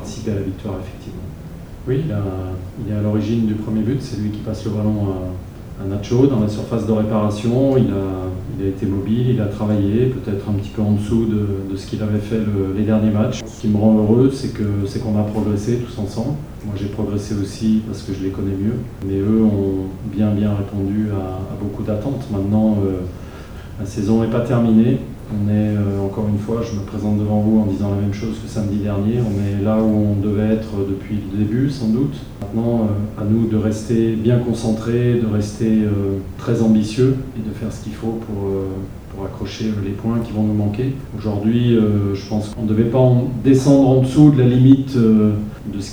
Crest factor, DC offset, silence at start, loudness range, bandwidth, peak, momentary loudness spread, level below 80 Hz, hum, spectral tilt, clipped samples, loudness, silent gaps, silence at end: 18 dB; under 0.1%; 0 s; 5 LU; over 20 kHz; 0 dBFS; 12 LU; -38 dBFS; none; -8.5 dB/octave; under 0.1%; -19 LUFS; none; 0 s